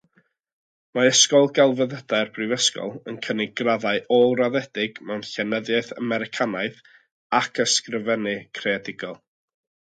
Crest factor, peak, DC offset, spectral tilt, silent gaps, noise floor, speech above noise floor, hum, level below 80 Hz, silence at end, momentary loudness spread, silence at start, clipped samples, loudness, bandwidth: 20 dB; -4 dBFS; under 0.1%; -2.5 dB/octave; 7.12-7.30 s; -65 dBFS; 42 dB; none; -72 dBFS; 0.85 s; 14 LU; 0.95 s; under 0.1%; -22 LUFS; 9.4 kHz